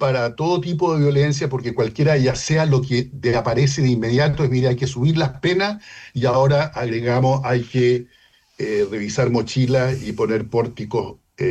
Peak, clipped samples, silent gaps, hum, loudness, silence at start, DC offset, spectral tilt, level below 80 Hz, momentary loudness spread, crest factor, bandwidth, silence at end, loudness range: -8 dBFS; under 0.1%; none; none; -19 LUFS; 0 s; under 0.1%; -6.5 dB/octave; -46 dBFS; 6 LU; 12 dB; 8.4 kHz; 0 s; 2 LU